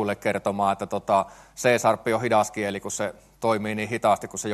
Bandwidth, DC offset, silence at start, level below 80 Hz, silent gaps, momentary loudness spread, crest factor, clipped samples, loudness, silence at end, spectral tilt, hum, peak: 13 kHz; under 0.1%; 0 s; -60 dBFS; none; 7 LU; 20 dB; under 0.1%; -25 LUFS; 0 s; -4.5 dB/octave; none; -6 dBFS